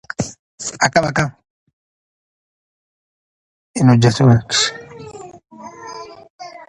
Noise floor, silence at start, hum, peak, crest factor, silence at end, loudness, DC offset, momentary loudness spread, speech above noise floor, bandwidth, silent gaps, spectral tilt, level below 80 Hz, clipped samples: -35 dBFS; 0.2 s; none; 0 dBFS; 20 dB; 0.05 s; -16 LUFS; under 0.1%; 25 LU; 21 dB; 11 kHz; 0.39-0.58 s, 1.50-1.67 s, 1.73-3.74 s, 6.30-6.39 s; -5 dB/octave; -48 dBFS; under 0.1%